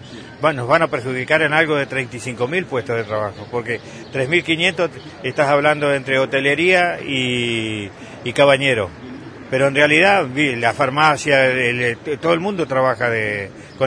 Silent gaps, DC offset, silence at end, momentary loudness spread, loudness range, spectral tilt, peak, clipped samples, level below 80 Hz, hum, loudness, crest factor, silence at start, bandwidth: none; under 0.1%; 0 s; 12 LU; 4 LU; -5 dB/octave; 0 dBFS; under 0.1%; -54 dBFS; none; -17 LUFS; 18 dB; 0 s; 10.5 kHz